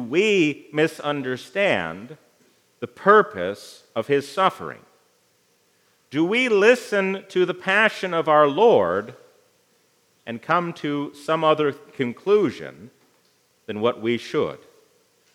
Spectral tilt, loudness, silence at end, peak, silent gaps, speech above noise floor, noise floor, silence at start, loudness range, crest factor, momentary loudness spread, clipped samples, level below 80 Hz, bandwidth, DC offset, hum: -5 dB/octave; -21 LUFS; 0.8 s; -2 dBFS; none; 42 dB; -63 dBFS; 0 s; 6 LU; 20 dB; 18 LU; under 0.1%; -74 dBFS; 14 kHz; under 0.1%; none